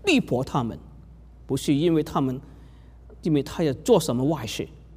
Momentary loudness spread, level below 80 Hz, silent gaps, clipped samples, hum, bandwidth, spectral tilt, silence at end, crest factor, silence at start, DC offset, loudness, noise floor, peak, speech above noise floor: 12 LU; -48 dBFS; none; under 0.1%; none; 16 kHz; -6 dB/octave; 0 s; 18 dB; 0.05 s; under 0.1%; -25 LUFS; -47 dBFS; -6 dBFS; 23 dB